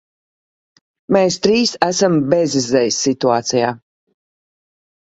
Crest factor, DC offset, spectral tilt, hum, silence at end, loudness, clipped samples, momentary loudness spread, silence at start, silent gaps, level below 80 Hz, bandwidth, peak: 18 dB; under 0.1%; -4 dB/octave; none; 1.25 s; -16 LUFS; under 0.1%; 4 LU; 1.1 s; none; -56 dBFS; 8.2 kHz; 0 dBFS